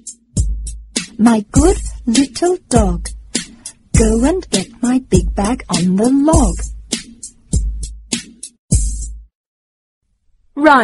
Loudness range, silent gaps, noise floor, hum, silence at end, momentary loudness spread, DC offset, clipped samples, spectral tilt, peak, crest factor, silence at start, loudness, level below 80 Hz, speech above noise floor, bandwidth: 8 LU; 8.59-8.68 s, 9.35-10.01 s; -56 dBFS; none; 0 s; 15 LU; under 0.1%; under 0.1%; -5 dB/octave; 0 dBFS; 16 dB; 0.05 s; -16 LUFS; -24 dBFS; 42 dB; 11.5 kHz